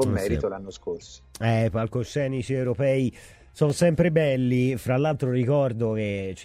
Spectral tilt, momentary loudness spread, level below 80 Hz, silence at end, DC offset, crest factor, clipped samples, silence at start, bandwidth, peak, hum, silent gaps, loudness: -7 dB/octave; 10 LU; -46 dBFS; 0 s; under 0.1%; 16 dB; under 0.1%; 0 s; 15 kHz; -8 dBFS; none; none; -24 LUFS